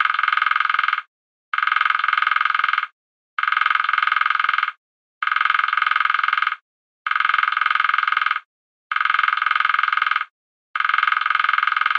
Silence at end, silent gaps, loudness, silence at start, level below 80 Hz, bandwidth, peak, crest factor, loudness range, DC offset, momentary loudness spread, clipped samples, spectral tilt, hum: 0 s; 1.08-1.52 s, 2.92-3.37 s, 4.77-5.21 s, 6.61-7.05 s, 8.45-8.90 s, 10.30-10.74 s; -19 LUFS; 0 s; under -90 dBFS; 7.2 kHz; -4 dBFS; 18 dB; 1 LU; under 0.1%; 9 LU; under 0.1%; 3.5 dB/octave; none